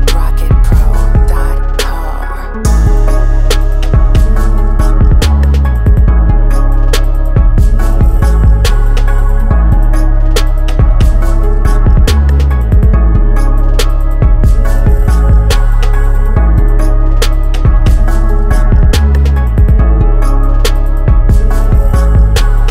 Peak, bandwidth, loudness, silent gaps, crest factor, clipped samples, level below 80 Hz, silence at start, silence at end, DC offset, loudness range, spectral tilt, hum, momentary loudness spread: 0 dBFS; 14 kHz; -11 LUFS; none; 6 dB; under 0.1%; -6 dBFS; 0 s; 0 s; under 0.1%; 2 LU; -6.5 dB/octave; none; 4 LU